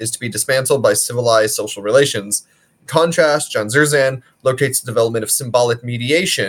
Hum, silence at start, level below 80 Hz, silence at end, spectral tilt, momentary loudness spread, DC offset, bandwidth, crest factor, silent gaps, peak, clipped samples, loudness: none; 0 s; -62 dBFS; 0 s; -3 dB/octave; 7 LU; under 0.1%; 18 kHz; 16 dB; none; 0 dBFS; under 0.1%; -16 LUFS